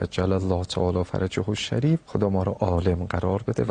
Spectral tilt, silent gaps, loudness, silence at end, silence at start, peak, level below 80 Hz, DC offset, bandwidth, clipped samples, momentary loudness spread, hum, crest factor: -7 dB/octave; none; -25 LUFS; 0 s; 0 s; -8 dBFS; -42 dBFS; under 0.1%; 9.8 kHz; under 0.1%; 3 LU; none; 16 dB